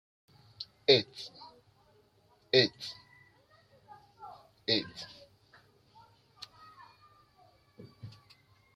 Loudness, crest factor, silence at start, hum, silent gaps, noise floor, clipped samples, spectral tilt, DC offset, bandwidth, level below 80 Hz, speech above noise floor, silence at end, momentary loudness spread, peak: -29 LUFS; 28 dB; 0.6 s; none; none; -67 dBFS; under 0.1%; -4.5 dB/octave; under 0.1%; 12 kHz; -76 dBFS; 37 dB; 0.65 s; 26 LU; -10 dBFS